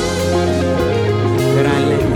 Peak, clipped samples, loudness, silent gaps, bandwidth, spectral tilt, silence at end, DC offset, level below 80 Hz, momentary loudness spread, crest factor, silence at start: -4 dBFS; under 0.1%; -15 LUFS; none; 17.5 kHz; -6 dB/octave; 0 s; under 0.1%; -34 dBFS; 2 LU; 10 dB; 0 s